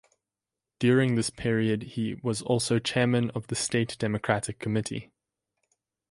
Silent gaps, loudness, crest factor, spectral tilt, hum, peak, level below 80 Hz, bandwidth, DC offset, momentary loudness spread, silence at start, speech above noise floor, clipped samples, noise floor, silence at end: none; -27 LUFS; 20 dB; -5 dB/octave; none; -8 dBFS; -58 dBFS; 11.5 kHz; under 0.1%; 7 LU; 0.8 s; 62 dB; under 0.1%; -89 dBFS; 1.1 s